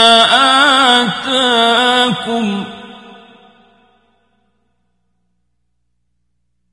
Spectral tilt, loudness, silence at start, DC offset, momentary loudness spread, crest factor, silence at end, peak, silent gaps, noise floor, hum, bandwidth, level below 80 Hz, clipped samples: -2.5 dB/octave; -10 LUFS; 0 s; under 0.1%; 13 LU; 16 dB; 3.75 s; 0 dBFS; none; -69 dBFS; 60 Hz at -60 dBFS; 11.5 kHz; -58 dBFS; under 0.1%